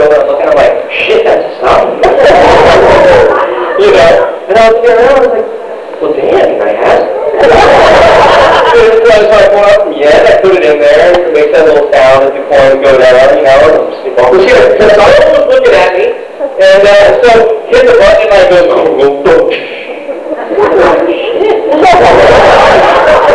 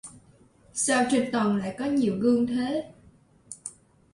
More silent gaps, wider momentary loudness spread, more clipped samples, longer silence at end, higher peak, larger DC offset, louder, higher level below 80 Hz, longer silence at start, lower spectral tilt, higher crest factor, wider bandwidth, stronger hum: neither; second, 8 LU vs 18 LU; first, 10% vs under 0.1%; second, 0 s vs 0.45 s; first, 0 dBFS vs -10 dBFS; first, 2% vs under 0.1%; first, -4 LUFS vs -25 LUFS; first, -30 dBFS vs -62 dBFS; about the same, 0 s vs 0.05 s; about the same, -4.5 dB/octave vs -4.5 dB/octave; second, 4 dB vs 16 dB; about the same, 11 kHz vs 11.5 kHz; neither